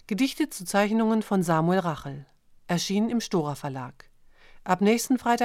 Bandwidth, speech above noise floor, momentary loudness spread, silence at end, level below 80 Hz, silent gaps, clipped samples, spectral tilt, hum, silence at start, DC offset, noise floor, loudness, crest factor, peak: 16 kHz; 26 dB; 14 LU; 0 s; -58 dBFS; none; under 0.1%; -5.5 dB/octave; none; 0.1 s; under 0.1%; -51 dBFS; -26 LUFS; 18 dB; -8 dBFS